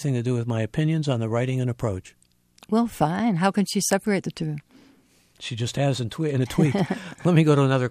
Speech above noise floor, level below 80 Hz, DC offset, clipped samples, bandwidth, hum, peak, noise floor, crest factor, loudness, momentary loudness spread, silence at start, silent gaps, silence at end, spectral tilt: 36 dB; -54 dBFS; under 0.1%; under 0.1%; 15 kHz; none; -6 dBFS; -59 dBFS; 18 dB; -24 LUFS; 10 LU; 0 s; none; 0 s; -6 dB/octave